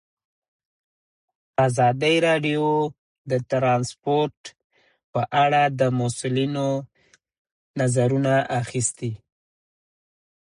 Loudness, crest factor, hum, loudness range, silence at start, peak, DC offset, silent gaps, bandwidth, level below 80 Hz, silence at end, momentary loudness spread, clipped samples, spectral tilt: -22 LUFS; 16 dB; none; 3 LU; 1.6 s; -8 dBFS; under 0.1%; 2.99-3.25 s, 4.37-4.44 s, 4.64-4.70 s, 5.04-5.13 s, 7.38-7.45 s, 7.52-7.74 s; 11.5 kHz; -62 dBFS; 1.35 s; 11 LU; under 0.1%; -5 dB/octave